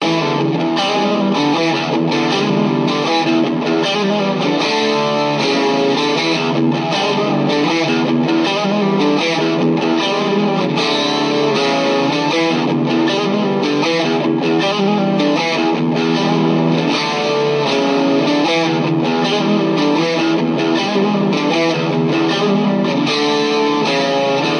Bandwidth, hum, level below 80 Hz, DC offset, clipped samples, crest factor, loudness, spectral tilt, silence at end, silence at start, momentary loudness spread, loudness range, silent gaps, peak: 9.8 kHz; none; -68 dBFS; under 0.1%; under 0.1%; 14 dB; -15 LUFS; -5.5 dB/octave; 0 s; 0 s; 1 LU; 0 LU; none; -2 dBFS